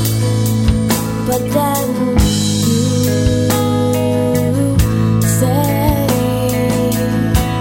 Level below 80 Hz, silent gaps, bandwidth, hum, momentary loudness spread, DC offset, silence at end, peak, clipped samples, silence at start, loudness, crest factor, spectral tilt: -26 dBFS; none; 16.5 kHz; none; 2 LU; under 0.1%; 0 s; -2 dBFS; under 0.1%; 0 s; -15 LUFS; 12 dB; -6 dB/octave